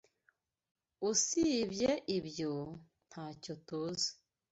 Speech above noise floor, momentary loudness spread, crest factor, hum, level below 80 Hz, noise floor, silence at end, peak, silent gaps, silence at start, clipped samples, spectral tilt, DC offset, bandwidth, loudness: 41 dB; 17 LU; 20 dB; none; -68 dBFS; -77 dBFS; 0.4 s; -18 dBFS; none; 1 s; under 0.1%; -3.5 dB/octave; under 0.1%; 8.2 kHz; -35 LUFS